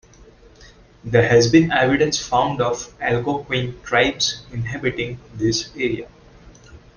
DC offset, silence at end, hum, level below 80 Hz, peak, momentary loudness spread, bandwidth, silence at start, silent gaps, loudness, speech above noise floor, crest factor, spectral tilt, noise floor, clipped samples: under 0.1%; 0.2 s; none; -46 dBFS; -2 dBFS; 13 LU; 10 kHz; 1.05 s; none; -19 LUFS; 28 dB; 18 dB; -4.5 dB/octave; -47 dBFS; under 0.1%